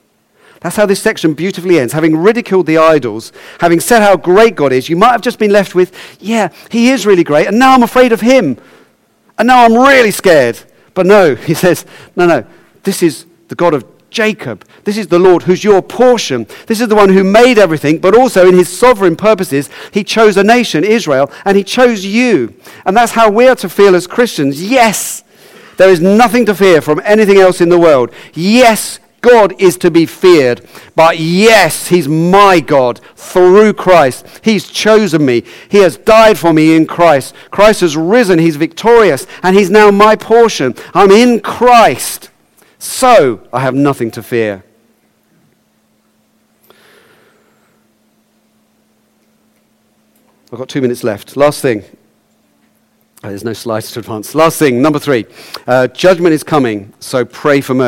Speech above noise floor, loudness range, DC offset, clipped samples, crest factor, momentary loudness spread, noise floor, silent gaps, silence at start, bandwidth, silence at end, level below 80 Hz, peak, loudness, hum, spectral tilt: 46 dB; 9 LU; under 0.1%; 0.7%; 10 dB; 12 LU; -55 dBFS; none; 0.65 s; 17 kHz; 0 s; -44 dBFS; 0 dBFS; -9 LUFS; none; -5 dB/octave